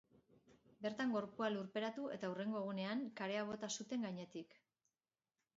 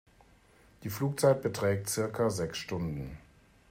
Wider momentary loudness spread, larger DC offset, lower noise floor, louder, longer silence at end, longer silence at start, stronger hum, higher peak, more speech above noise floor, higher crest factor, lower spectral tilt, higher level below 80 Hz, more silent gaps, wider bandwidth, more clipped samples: second, 7 LU vs 15 LU; neither; first, under -90 dBFS vs -61 dBFS; second, -44 LUFS vs -31 LUFS; first, 1.1 s vs 0.5 s; second, 0.5 s vs 0.8 s; neither; second, -26 dBFS vs -14 dBFS; first, over 47 dB vs 31 dB; about the same, 18 dB vs 20 dB; about the same, -4 dB/octave vs -5 dB/octave; second, -86 dBFS vs -58 dBFS; neither; second, 7.6 kHz vs 16 kHz; neither